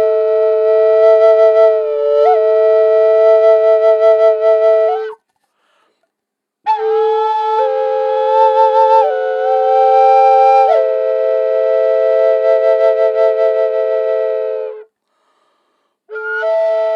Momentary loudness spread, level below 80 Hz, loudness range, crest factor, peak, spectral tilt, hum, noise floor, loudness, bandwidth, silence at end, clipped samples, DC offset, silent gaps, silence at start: 8 LU; under -90 dBFS; 7 LU; 12 dB; 0 dBFS; -1 dB/octave; none; -78 dBFS; -12 LUFS; 6.2 kHz; 0 s; under 0.1%; under 0.1%; none; 0 s